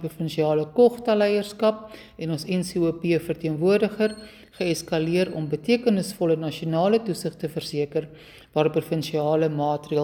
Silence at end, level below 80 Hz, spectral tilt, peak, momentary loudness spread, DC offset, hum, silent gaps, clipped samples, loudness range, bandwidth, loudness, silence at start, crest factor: 0 s; -58 dBFS; -6 dB/octave; -6 dBFS; 9 LU; under 0.1%; none; none; under 0.1%; 2 LU; 18 kHz; -24 LUFS; 0 s; 18 dB